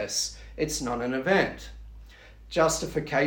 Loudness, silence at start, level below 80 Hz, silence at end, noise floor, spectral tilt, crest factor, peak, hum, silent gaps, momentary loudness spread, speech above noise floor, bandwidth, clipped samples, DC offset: -27 LUFS; 0 s; -46 dBFS; 0 s; -48 dBFS; -3.5 dB/octave; 20 dB; -8 dBFS; none; none; 15 LU; 22 dB; 18 kHz; under 0.1%; under 0.1%